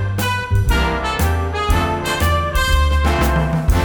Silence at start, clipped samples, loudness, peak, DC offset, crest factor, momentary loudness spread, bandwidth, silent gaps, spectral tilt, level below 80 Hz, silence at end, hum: 0 s; under 0.1%; -17 LUFS; -4 dBFS; under 0.1%; 14 dB; 3 LU; over 20 kHz; none; -5 dB/octave; -20 dBFS; 0 s; none